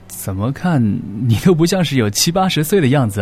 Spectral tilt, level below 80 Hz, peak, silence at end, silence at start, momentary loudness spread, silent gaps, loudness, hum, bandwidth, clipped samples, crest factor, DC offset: -5 dB/octave; -42 dBFS; 0 dBFS; 0 s; 0.05 s; 7 LU; none; -15 LUFS; none; 16 kHz; under 0.1%; 14 dB; under 0.1%